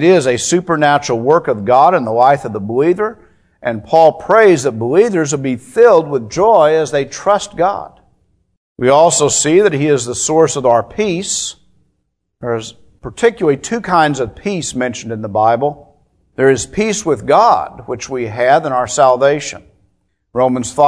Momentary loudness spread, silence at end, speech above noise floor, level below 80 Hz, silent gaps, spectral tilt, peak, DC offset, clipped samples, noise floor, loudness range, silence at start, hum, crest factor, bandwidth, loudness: 12 LU; 0 s; 56 dB; -48 dBFS; 8.57-8.75 s; -4.5 dB/octave; 0 dBFS; under 0.1%; 0.2%; -68 dBFS; 5 LU; 0 s; none; 14 dB; 11 kHz; -13 LUFS